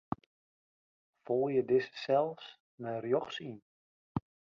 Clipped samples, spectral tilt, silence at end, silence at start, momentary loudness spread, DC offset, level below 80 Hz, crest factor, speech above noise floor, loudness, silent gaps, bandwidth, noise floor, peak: under 0.1%; -7 dB/octave; 0.35 s; 0.1 s; 17 LU; under 0.1%; -68 dBFS; 20 dB; over 57 dB; -34 LUFS; 0.26-1.13 s, 2.60-2.78 s, 3.62-4.15 s; 7 kHz; under -90 dBFS; -16 dBFS